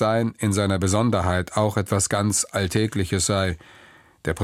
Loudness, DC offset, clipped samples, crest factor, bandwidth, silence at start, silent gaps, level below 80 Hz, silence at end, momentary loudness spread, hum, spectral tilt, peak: -22 LUFS; under 0.1%; under 0.1%; 16 dB; 15.5 kHz; 0 s; none; -46 dBFS; 0 s; 4 LU; none; -4.5 dB/octave; -6 dBFS